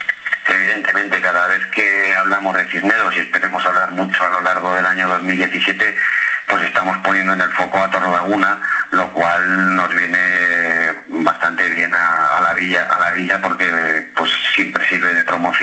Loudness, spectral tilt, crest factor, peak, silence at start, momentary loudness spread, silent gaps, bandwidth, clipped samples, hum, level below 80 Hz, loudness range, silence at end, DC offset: -15 LUFS; -4 dB/octave; 16 dB; 0 dBFS; 0 s; 3 LU; none; 8.8 kHz; under 0.1%; none; -60 dBFS; 1 LU; 0 s; under 0.1%